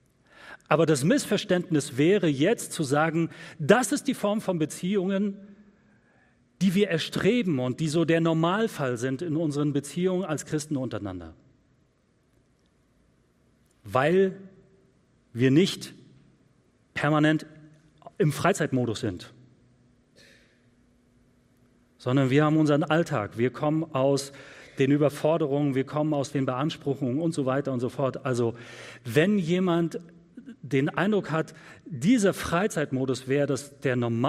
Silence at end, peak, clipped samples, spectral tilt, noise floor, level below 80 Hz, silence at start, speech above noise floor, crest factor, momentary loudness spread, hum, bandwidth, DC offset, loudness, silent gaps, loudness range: 0 s; -4 dBFS; under 0.1%; -6 dB/octave; -66 dBFS; -64 dBFS; 0.4 s; 41 dB; 22 dB; 13 LU; none; 15.5 kHz; under 0.1%; -26 LUFS; none; 6 LU